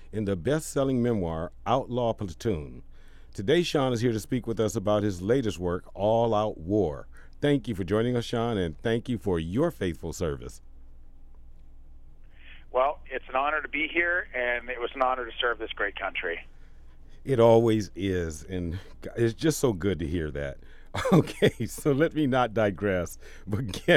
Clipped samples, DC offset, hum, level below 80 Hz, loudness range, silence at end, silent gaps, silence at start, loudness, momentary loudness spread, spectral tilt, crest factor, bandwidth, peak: under 0.1%; under 0.1%; none; -46 dBFS; 5 LU; 0 s; none; 0 s; -27 LUFS; 10 LU; -6 dB/octave; 20 dB; 16 kHz; -6 dBFS